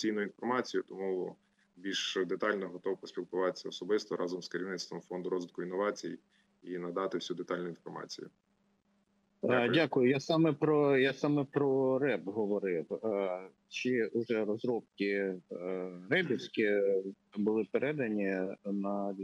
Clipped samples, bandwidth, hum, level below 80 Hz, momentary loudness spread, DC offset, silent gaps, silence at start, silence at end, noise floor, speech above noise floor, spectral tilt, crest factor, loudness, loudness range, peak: under 0.1%; 9 kHz; none; -86 dBFS; 13 LU; under 0.1%; none; 0 s; 0 s; -74 dBFS; 41 dB; -5.5 dB/octave; 18 dB; -34 LUFS; 8 LU; -16 dBFS